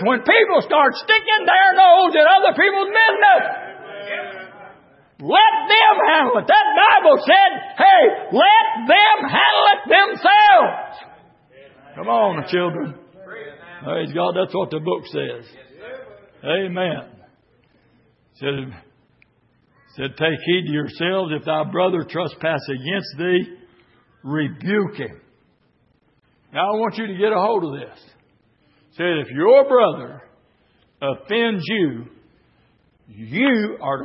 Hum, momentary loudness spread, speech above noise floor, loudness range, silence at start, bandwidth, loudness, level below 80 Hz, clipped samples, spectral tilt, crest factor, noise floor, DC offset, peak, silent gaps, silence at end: none; 19 LU; 45 dB; 14 LU; 0 s; 5.8 kHz; -16 LUFS; -66 dBFS; under 0.1%; -9 dB/octave; 16 dB; -61 dBFS; under 0.1%; -2 dBFS; none; 0 s